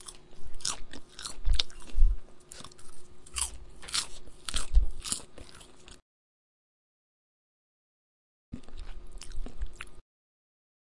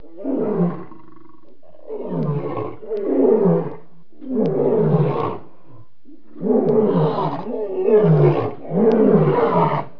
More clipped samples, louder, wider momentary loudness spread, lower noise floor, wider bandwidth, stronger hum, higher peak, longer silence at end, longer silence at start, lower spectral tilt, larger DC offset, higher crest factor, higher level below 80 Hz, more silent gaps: neither; second, -34 LUFS vs -19 LUFS; first, 20 LU vs 13 LU; about the same, -51 dBFS vs -50 dBFS; first, 11.5 kHz vs 5.4 kHz; neither; about the same, -4 dBFS vs -2 dBFS; first, 1 s vs 0.1 s; second, 0 s vs 0.15 s; second, -2 dB/octave vs -11.5 dB/octave; second, under 0.1% vs 2%; first, 26 dB vs 16 dB; first, -34 dBFS vs -58 dBFS; first, 6.02-8.52 s vs none